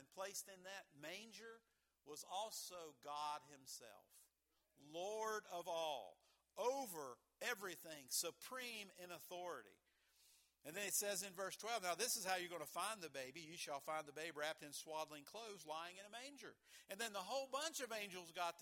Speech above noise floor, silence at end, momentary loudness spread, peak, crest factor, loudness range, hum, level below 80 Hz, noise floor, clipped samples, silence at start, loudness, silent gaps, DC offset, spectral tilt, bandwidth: 36 dB; 0 s; 14 LU; -26 dBFS; 24 dB; 7 LU; none; under -90 dBFS; -86 dBFS; under 0.1%; 0 s; -48 LUFS; none; under 0.1%; -1 dB/octave; 19 kHz